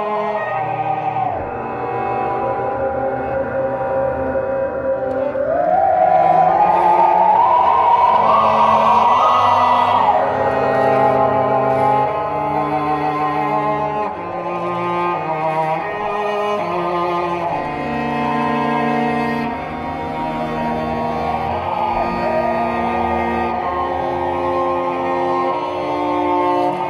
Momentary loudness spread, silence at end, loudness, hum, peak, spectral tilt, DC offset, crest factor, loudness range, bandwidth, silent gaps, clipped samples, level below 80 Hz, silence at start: 9 LU; 0 s; -17 LUFS; none; -4 dBFS; -7 dB/octave; under 0.1%; 12 dB; 8 LU; 12 kHz; none; under 0.1%; -44 dBFS; 0 s